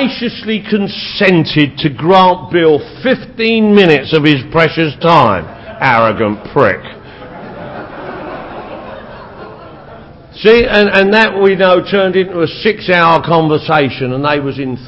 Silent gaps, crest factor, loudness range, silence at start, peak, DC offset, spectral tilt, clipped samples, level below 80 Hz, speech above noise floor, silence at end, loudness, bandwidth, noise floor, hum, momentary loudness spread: none; 12 dB; 10 LU; 0 s; 0 dBFS; under 0.1%; -7.5 dB/octave; 0.3%; -40 dBFS; 23 dB; 0 s; -11 LUFS; 8 kHz; -34 dBFS; none; 20 LU